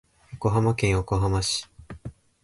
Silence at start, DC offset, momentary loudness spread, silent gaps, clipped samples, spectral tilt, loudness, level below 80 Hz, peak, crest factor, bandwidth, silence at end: 0.3 s; under 0.1%; 19 LU; none; under 0.1%; -5 dB/octave; -25 LUFS; -40 dBFS; -10 dBFS; 16 dB; 11.5 kHz; 0.3 s